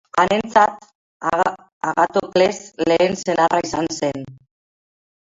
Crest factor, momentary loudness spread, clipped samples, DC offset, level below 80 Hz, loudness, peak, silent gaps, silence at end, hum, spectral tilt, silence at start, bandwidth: 18 dB; 9 LU; under 0.1%; under 0.1%; -56 dBFS; -19 LUFS; -2 dBFS; 0.95-1.20 s, 1.72-1.80 s; 1.05 s; none; -4.5 dB/octave; 0.15 s; 8 kHz